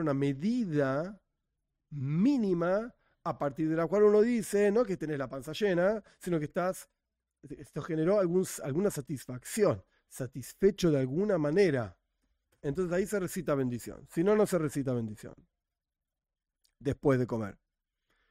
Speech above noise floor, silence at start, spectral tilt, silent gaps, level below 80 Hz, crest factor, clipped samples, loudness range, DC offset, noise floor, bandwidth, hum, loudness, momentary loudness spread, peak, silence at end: 60 dB; 0 s; -6.5 dB/octave; none; -60 dBFS; 18 dB; under 0.1%; 5 LU; under 0.1%; -90 dBFS; 16 kHz; none; -30 LUFS; 14 LU; -14 dBFS; 0.8 s